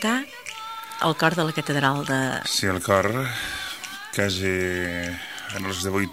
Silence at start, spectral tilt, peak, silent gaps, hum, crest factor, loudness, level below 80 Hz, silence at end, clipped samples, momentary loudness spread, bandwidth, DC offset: 0 s; -4 dB/octave; -4 dBFS; none; none; 22 dB; -25 LUFS; -56 dBFS; 0 s; under 0.1%; 12 LU; 16 kHz; 0.1%